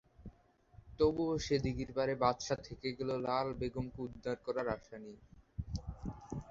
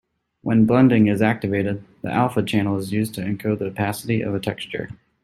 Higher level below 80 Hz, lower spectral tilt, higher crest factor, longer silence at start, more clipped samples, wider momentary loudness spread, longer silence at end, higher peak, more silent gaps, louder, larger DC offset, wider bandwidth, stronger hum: about the same, -54 dBFS vs -54 dBFS; second, -5.5 dB/octave vs -7 dB/octave; about the same, 22 dB vs 18 dB; second, 0.2 s vs 0.45 s; neither; first, 17 LU vs 14 LU; second, 0 s vs 0.3 s; second, -16 dBFS vs -2 dBFS; neither; second, -37 LUFS vs -21 LUFS; neither; second, 7.6 kHz vs 14.5 kHz; neither